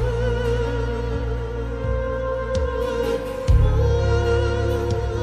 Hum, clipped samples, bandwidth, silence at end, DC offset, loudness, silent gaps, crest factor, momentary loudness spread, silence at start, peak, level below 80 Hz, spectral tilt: none; under 0.1%; 13.5 kHz; 0 s; under 0.1%; -23 LUFS; none; 16 dB; 7 LU; 0 s; -6 dBFS; -24 dBFS; -7 dB/octave